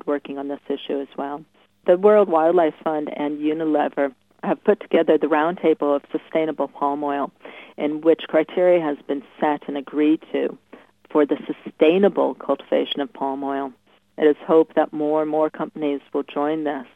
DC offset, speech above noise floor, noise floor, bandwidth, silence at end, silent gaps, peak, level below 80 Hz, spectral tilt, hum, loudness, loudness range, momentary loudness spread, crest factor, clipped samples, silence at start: under 0.1%; 27 dB; -48 dBFS; 4 kHz; 0.1 s; none; -2 dBFS; -74 dBFS; -8 dB/octave; none; -21 LUFS; 2 LU; 11 LU; 18 dB; under 0.1%; 0.05 s